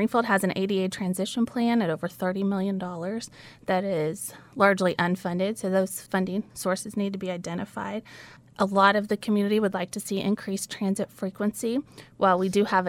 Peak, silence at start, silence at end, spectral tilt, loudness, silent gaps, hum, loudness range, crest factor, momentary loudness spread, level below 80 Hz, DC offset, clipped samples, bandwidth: -4 dBFS; 0 s; 0 s; -5.5 dB/octave; -26 LUFS; none; none; 3 LU; 22 dB; 11 LU; -66 dBFS; under 0.1%; under 0.1%; 16.5 kHz